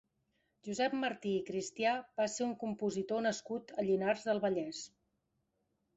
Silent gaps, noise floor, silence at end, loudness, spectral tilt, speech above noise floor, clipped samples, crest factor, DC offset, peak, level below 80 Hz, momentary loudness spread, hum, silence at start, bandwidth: none; -82 dBFS; 1.1 s; -36 LUFS; -4.5 dB/octave; 46 dB; under 0.1%; 18 dB; under 0.1%; -20 dBFS; -76 dBFS; 9 LU; none; 0.65 s; 8.2 kHz